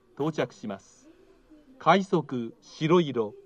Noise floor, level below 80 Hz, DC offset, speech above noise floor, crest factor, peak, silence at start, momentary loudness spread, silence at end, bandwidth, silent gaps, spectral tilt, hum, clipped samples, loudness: -56 dBFS; -68 dBFS; under 0.1%; 30 dB; 22 dB; -6 dBFS; 0.2 s; 16 LU; 0.1 s; 8.6 kHz; none; -6.5 dB/octave; none; under 0.1%; -26 LUFS